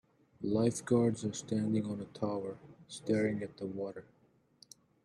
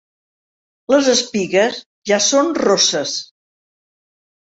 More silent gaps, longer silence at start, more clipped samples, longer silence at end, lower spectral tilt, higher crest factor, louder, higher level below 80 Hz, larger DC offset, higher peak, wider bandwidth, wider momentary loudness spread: second, none vs 1.86-2.02 s; second, 0.4 s vs 0.9 s; neither; second, 1 s vs 1.35 s; first, -6.5 dB/octave vs -2 dB/octave; about the same, 20 dB vs 18 dB; second, -35 LUFS vs -16 LUFS; second, -70 dBFS vs -62 dBFS; neither; second, -16 dBFS vs -2 dBFS; first, 12 kHz vs 8 kHz; first, 14 LU vs 9 LU